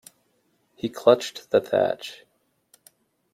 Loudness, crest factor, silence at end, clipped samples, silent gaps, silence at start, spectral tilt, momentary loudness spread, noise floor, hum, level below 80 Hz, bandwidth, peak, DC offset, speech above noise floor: -23 LUFS; 22 dB; 1.2 s; under 0.1%; none; 0.85 s; -4.5 dB/octave; 14 LU; -68 dBFS; none; -70 dBFS; 15.5 kHz; -4 dBFS; under 0.1%; 46 dB